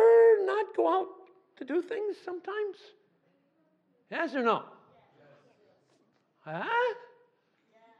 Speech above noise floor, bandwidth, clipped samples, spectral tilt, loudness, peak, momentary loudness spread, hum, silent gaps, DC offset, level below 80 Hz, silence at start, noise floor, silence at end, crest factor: 40 dB; 6 kHz; under 0.1%; -6 dB/octave; -29 LUFS; -12 dBFS; 18 LU; none; none; under 0.1%; under -90 dBFS; 0 s; -71 dBFS; 1 s; 18 dB